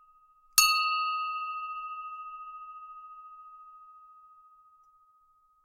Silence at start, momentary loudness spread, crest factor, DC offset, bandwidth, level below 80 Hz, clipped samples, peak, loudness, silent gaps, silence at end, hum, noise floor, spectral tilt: 0.55 s; 27 LU; 32 dB; under 0.1%; 16 kHz; -70 dBFS; under 0.1%; -2 dBFS; -28 LUFS; none; 1.4 s; none; -66 dBFS; 5 dB/octave